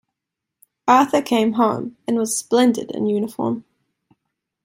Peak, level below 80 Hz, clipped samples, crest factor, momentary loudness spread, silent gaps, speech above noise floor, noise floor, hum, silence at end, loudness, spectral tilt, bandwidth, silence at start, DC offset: -2 dBFS; -66 dBFS; under 0.1%; 20 dB; 10 LU; none; 65 dB; -83 dBFS; none; 1.05 s; -19 LUFS; -4.5 dB/octave; 16 kHz; 0.85 s; under 0.1%